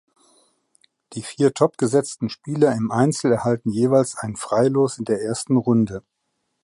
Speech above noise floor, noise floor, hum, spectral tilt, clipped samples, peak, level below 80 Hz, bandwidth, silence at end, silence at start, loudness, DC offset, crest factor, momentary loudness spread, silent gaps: 54 dB; -74 dBFS; none; -6 dB/octave; under 0.1%; -4 dBFS; -58 dBFS; 11.5 kHz; 0.65 s; 1.1 s; -21 LUFS; under 0.1%; 18 dB; 10 LU; none